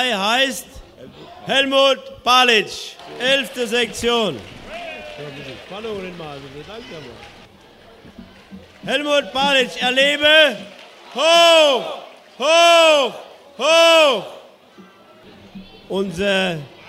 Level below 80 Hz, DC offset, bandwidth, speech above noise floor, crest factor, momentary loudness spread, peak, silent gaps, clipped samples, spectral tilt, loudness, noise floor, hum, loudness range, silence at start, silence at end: -52 dBFS; under 0.1%; 16 kHz; 29 dB; 18 dB; 23 LU; 0 dBFS; none; under 0.1%; -2 dB/octave; -15 LUFS; -46 dBFS; none; 19 LU; 0 s; 0.2 s